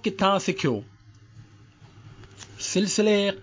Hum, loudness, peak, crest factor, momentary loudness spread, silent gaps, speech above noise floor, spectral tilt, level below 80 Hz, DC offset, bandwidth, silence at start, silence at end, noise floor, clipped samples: none; -24 LUFS; -8 dBFS; 18 dB; 15 LU; none; 28 dB; -4 dB/octave; -60 dBFS; under 0.1%; 7.8 kHz; 0.05 s; 0 s; -51 dBFS; under 0.1%